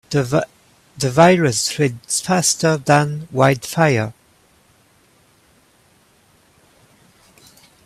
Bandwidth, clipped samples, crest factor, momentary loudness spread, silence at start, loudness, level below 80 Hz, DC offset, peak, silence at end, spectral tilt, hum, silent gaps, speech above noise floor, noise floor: 15 kHz; under 0.1%; 20 dB; 10 LU; 0.1 s; -17 LUFS; -54 dBFS; under 0.1%; 0 dBFS; 3.75 s; -4.5 dB/octave; none; none; 39 dB; -55 dBFS